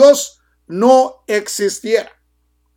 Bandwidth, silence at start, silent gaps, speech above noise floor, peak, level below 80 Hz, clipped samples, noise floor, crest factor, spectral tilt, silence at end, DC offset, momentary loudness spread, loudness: 17 kHz; 0 s; none; 47 dB; 0 dBFS; -60 dBFS; under 0.1%; -62 dBFS; 14 dB; -3 dB/octave; 0.75 s; under 0.1%; 16 LU; -15 LUFS